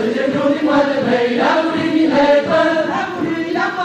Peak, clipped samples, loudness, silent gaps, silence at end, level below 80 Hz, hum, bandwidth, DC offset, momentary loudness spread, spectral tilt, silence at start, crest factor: -4 dBFS; under 0.1%; -15 LUFS; none; 0 s; -54 dBFS; none; 9.4 kHz; under 0.1%; 7 LU; -5.5 dB/octave; 0 s; 12 dB